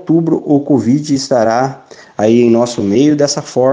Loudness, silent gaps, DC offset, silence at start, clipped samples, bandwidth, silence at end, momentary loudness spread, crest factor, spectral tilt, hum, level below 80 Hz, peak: -12 LUFS; none; under 0.1%; 0 s; under 0.1%; 9.8 kHz; 0 s; 5 LU; 12 dB; -6 dB/octave; none; -54 dBFS; 0 dBFS